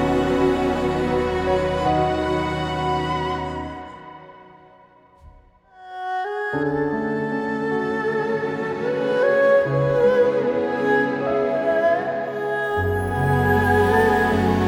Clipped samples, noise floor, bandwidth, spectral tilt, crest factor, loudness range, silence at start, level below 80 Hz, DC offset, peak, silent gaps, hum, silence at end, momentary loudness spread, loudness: under 0.1%; -51 dBFS; 19 kHz; -7 dB/octave; 16 dB; 10 LU; 0 s; -42 dBFS; under 0.1%; -6 dBFS; none; none; 0 s; 9 LU; -21 LUFS